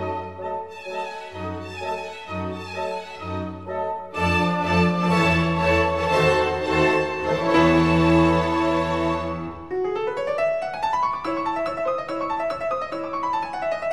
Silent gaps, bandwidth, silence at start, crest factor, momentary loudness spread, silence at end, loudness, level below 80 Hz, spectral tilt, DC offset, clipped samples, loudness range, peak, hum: none; 12 kHz; 0 s; 16 dB; 13 LU; 0 s; -23 LUFS; -42 dBFS; -6.5 dB/octave; 0.3%; under 0.1%; 11 LU; -6 dBFS; none